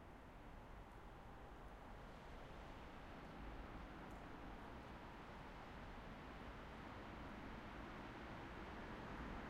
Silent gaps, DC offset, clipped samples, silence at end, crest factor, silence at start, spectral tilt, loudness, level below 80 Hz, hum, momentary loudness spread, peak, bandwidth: none; under 0.1%; under 0.1%; 0 s; 14 dB; 0 s; -6 dB/octave; -56 LUFS; -60 dBFS; none; 6 LU; -40 dBFS; 15.5 kHz